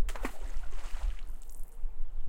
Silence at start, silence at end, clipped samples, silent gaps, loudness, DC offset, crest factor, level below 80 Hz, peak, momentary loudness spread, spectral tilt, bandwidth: 0 s; 0 s; under 0.1%; none; -44 LUFS; under 0.1%; 12 dB; -34 dBFS; -18 dBFS; 8 LU; -5 dB/octave; 10.5 kHz